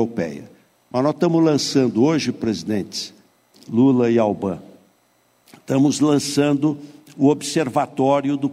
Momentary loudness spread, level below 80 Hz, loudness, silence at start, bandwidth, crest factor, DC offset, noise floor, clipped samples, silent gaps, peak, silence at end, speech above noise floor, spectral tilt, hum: 11 LU; -62 dBFS; -19 LUFS; 0 s; 14.5 kHz; 14 dB; under 0.1%; -61 dBFS; under 0.1%; none; -6 dBFS; 0 s; 42 dB; -5.5 dB/octave; none